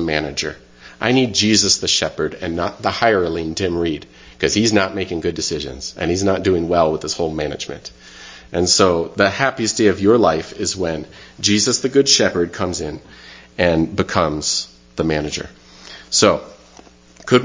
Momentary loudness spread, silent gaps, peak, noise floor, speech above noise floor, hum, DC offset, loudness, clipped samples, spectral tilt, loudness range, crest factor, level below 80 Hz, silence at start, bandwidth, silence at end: 15 LU; none; 0 dBFS; -45 dBFS; 27 dB; none; under 0.1%; -17 LUFS; under 0.1%; -3.5 dB/octave; 4 LU; 18 dB; -40 dBFS; 0 s; 7.8 kHz; 0 s